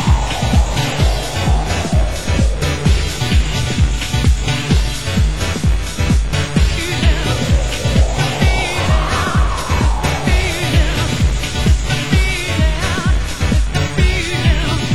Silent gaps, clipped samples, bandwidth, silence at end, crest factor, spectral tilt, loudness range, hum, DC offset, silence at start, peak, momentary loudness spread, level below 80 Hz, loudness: none; under 0.1%; 16 kHz; 0 s; 14 dB; -5 dB/octave; 1 LU; none; 3%; 0 s; 0 dBFS; 2 LU; -18 dBFS; -16 LUFS